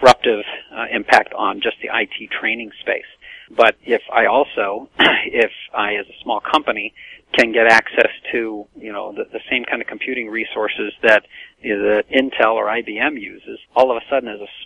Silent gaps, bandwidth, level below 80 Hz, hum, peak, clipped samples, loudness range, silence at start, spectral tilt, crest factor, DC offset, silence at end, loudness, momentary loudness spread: none; 11.5 kHz; -54 dBFS; none; 0 dBFS; under 0.1%; 3 LU; 0 s; -3.5 dB/octave; 18 dB; under 0.1%; 0 s; -17 LUFS; 14 LU